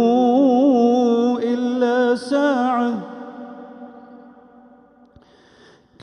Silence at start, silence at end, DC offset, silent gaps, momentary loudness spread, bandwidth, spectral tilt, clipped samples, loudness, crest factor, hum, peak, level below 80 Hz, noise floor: 0 s; 1.85 s; under 0.1%; none; 22 LU; 10.5 kHz; -6 dB/octave; under 0.1%; -18 LUFS; 14 dB; none; -6 dBFS; -66 dBFS; -51 dBFS